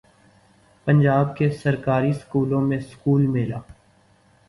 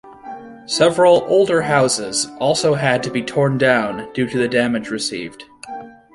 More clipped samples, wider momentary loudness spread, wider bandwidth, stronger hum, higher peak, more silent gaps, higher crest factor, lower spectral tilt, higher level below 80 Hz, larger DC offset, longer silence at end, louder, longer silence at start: neither; second, 8 LU vs 20 LU; about the same, 11.5 kHz vs 11.5 kHz; neither; second, -6 dBFS vs -2 dBFS; neither; about the same, 16 dB vs 16 dB; first, -9 dB/octave vs -4 dB/octave; about the same, -52 dBFS vs -56 dBFS; neither; first, 0.75 s vs 0.25 s; second, -21 LUFS vs -17 LUFS; first, 0.85 s vs 0.05 s